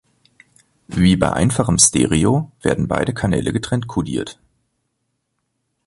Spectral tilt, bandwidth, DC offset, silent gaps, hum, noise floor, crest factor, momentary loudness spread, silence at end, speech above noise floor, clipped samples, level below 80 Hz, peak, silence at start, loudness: -4.5 dB/octave; 11.5 kHz; under 0.1%; none; none; -73 dBFS; 20 dB; 11 LU; 1.55 s; 56 dB; under 0.1%; -38 dBFS; 0 dBFS; 0.9 s; -17 LUFS